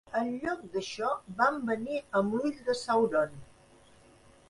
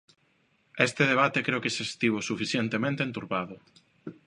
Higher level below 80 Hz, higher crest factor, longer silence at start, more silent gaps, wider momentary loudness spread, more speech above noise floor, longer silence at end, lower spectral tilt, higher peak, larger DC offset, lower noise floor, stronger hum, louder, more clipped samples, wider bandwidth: about the same, -64 dBFS vs -68 dBFS; about the same, 20 dB vs 22 dB; second, 0.1 s vs 0.75 s; neither; second, 7 LU vs 16 LU; second, 28 dB vs 41 dB; first, 1.05 s vs 0.15 s; about the same, -5 dB/octave vs -4.5 dB/octave; second, -12 dBFS vs -8 dBFS; neither; second, -59 dBFS vs -69 dBFS; neither; second, -31 LUFS vs -27 LUFS; neither; about the same, 11.5 kHz vs 11 kHz